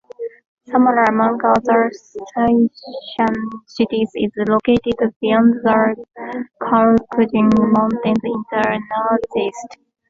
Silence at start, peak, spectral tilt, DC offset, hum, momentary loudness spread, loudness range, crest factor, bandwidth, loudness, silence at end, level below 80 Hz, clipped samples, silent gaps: 0.2 s; -2 dBFS; -7 dB/octave; under 0.1%; none; 15 LU; 3 LU; 16 dB; 7.6 kHz; -17 LUFS; 0.35 s; -50 dBFS; under 0.1%; 0.47-0.57 s, 5.16-5.20 s